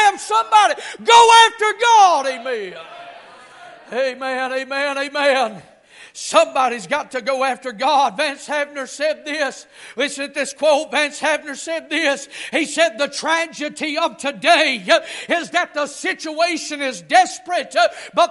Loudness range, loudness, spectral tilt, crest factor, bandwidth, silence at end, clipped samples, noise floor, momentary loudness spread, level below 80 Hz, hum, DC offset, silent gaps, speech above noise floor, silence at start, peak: 7 LU; -17 LUFS; -1 dB/octave; 18 dB; 11.5 kHz; 0 s; under 0.1%; -42 dBFS; 12 LU; -68 dBFS; none; under 0.1%; none; 24 dB; 0 s; 0 dBFS